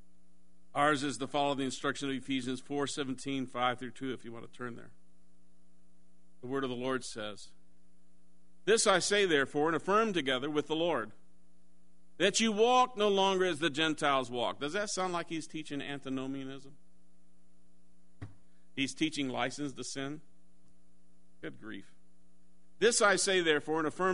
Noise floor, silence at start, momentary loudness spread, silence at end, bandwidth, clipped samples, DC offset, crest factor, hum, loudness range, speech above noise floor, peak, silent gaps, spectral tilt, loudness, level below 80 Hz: -69 dBFS; 0.75 s; 19 LU; 0 s; 10.5 kHz; under 0.1%; 0.5%; 22 dB; none; 11 LU; 37 dB; -12 dBFS; none; -3 dB/octave; -32 LUFS; -70 dBFS